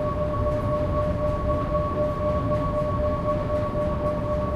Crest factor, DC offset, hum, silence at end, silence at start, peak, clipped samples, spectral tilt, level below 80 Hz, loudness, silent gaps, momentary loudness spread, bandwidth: 12 dB; under 0.1%; none; 0 s; 0 s; -12 dBFS; under 0.1%; -9 dB/octave; -32 dBFS; -25 LUFS; none; 1 LU; 11.5 kHz